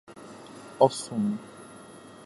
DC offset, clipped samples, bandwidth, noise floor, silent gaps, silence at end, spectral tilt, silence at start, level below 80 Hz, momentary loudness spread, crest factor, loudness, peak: under 0.1%; under 0.1%; 11.5 kHz; -48 dBFS; none; 0 s; -5.5 dB/octave; 0.1 s; -72 dBFS; 23 LU; 26 dB; -27 LUFS; -4 dBFS